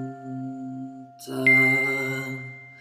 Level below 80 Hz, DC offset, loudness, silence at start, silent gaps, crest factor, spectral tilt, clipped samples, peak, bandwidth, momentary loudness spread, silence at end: -82 dBFS; under 0.1%; -20 LUFS; 0 s; none; 16 dB; -5.5 dB/octave; under 0.1%; -8 dBFS; 16 kHz; 22 LU; 0 s